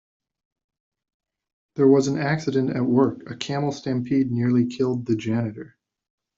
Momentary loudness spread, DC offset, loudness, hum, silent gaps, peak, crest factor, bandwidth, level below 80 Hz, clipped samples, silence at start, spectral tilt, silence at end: 10 LU; under 0.1%; -23 LUFS; none; none; -6 dBFS; 18 dB; 7.6 kHz; -62 dBFS; under 0.1%; 1.75 s; -7 dB/octave; 0.7 s